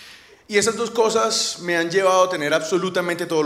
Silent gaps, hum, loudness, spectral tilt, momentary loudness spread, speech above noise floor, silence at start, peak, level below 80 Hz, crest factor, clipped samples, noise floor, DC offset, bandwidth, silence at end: none; none; -20 LUFS; -3 dB/octave; 5 LU; 25 dB; 0 s; -4 dBFS; -64 dBFS; 16 dB; under 0.1%; -45 dBFS; under 0.1%; 15.5 kHz; 0 s